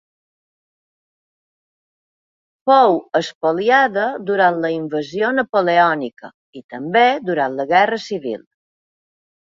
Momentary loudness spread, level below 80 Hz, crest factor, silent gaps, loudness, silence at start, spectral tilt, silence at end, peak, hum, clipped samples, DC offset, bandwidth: 11 LU; -68 dBFS; 18 dB; 3.35-3.41 s, 5.49-5.53 s, 6.34-6.53 s, 6.64-6.69 s; -17 LUFS; 2.65 s; -5.5 dB/octave; 1.15 s; -2 dBFS; none; under 0.1%; under 0.1%; 7.6 kHz